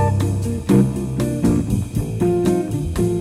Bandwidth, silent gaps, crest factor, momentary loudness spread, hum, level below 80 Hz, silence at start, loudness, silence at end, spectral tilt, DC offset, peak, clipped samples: 15.5 kHz; none; 16 dB; 6 LU; none; -32 dBFS; 0 s; -19 LUFS; 0 s; -7.5 dB/octave; under 0.1%; -2 dBFS; under 0.1%